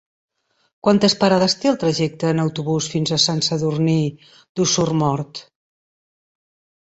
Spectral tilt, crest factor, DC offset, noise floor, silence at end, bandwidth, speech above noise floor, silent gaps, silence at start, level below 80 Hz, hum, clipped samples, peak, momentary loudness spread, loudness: -4.5 dB/octave; 18 dB; under 0.1%; under -90 dBFS; 1.4 s; 8.2 kHz; over 71 dB; 4.49-4.55 s; 0.85 s; -56 dBFS; none; under 0.1%; -2 dBFS; 8 LU; -19 LUFS